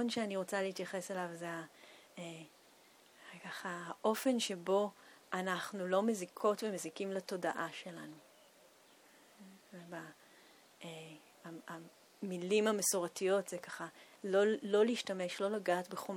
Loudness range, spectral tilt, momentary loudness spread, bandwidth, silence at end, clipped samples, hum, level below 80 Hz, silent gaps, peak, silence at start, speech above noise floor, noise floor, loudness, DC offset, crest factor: 18 LU; -3.5 dB/octave; 20 LU; 19.5 kHz; 0 s; under 0.1%; none; -90 dBFS; none; -20 dBFS; 0 s; 27 dB; -65 dBFS; -37 LUFS; under 0.1%; 18 dB